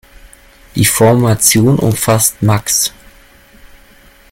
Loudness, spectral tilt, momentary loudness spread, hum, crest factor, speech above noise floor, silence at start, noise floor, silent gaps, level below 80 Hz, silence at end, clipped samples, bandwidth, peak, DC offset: -11 LUFS; -4 dB/octave; 5 LU; none; 14 dB; 32 dB; 0.25 s; -43 dBFS; none; -40 dBFS; 1.4 s; under 0.1%; 17 kHz; 0 dBFS; under 0.1%